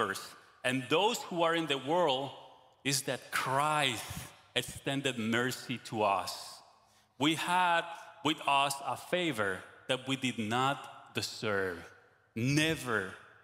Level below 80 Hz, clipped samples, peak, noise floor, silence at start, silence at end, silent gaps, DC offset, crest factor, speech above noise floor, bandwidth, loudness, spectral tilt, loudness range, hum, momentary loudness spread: -68 dBFS; under 0.1%; -12 dBFS; -66 dBFS; 0 s; 0.2 s; none; under 0.1%; 20 dB; 33 dB; 16 kHz; -32 LUFS; -3.5 dB/octave; 3 LU; none; 12 LU